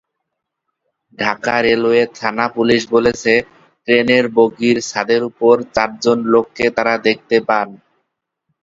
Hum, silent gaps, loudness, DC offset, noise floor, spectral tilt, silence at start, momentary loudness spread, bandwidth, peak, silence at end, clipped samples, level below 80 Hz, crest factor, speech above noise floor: none; none; -15 LUFS; under 0.1%; -77 dBFS; -4.5 dB/octave; 1.2 s; 6 LU; 7.8 kHz; 0 dBFS; 0.85 s; under 0.1%; -54 dBFS; 16 dB; 62 dB